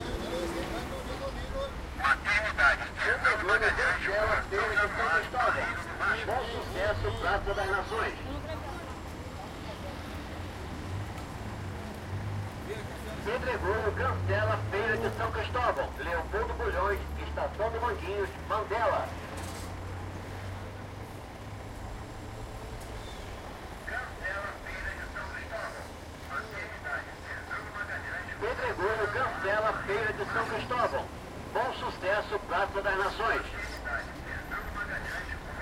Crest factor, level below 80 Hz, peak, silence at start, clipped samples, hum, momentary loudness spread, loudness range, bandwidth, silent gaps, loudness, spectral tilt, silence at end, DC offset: 22 dB; -44 dBFS; -12 dBFS; 0 s; under 0.1%; none; 14 LU; 12 LU; 16 kHz; none; -32 LUFS; -5 dB/octave; 0 s; under 0.1%